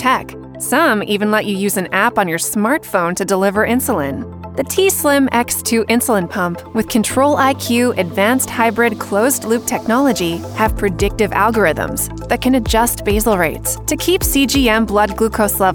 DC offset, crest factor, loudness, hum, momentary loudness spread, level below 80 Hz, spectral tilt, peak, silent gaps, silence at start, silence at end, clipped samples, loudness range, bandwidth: under 0.1%; 14 dB; -15 LUFS; none; 6 LU; -32 dBFS; -4 dB/octave; 0 dBFS; none; 0 s; 0 s; under 0.1%; 1 LU; over 20 kHz